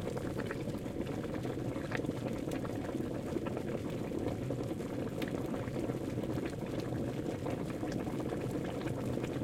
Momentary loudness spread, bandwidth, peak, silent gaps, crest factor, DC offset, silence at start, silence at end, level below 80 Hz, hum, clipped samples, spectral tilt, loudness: 1 LU; 16.5 kHz; -20 dBFS; none; 16 dB; under 0.1%; 0 s; 0 s; -56 dBFS; none; under 0.1%; -7 dB/octave; -38 LUFS